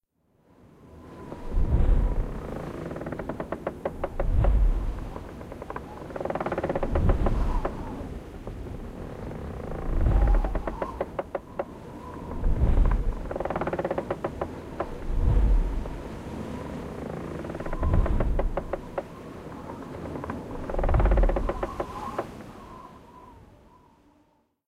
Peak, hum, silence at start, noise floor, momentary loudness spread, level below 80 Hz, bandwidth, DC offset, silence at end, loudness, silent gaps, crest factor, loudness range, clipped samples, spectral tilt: -10 dBFS; none; 0.8 s; -66 dBFS; 15 LU; -28 dBFS; 7.4 kHz; under 0.1%; 1.1 s; -31 LUFS; none; 18 dB; 2 LU; under 0.1%; -8.5 dB/octave